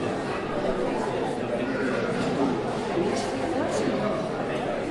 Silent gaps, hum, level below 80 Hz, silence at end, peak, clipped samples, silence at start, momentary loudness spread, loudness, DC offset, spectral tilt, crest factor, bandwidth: none; none; -50 dBFS; 0 s; -12 dBFS; under 0.1%; 0 s; 3 LU; -27 LUFS; under 0.1%; -5.5 dB/octave; 14 dB; 11.5 kHz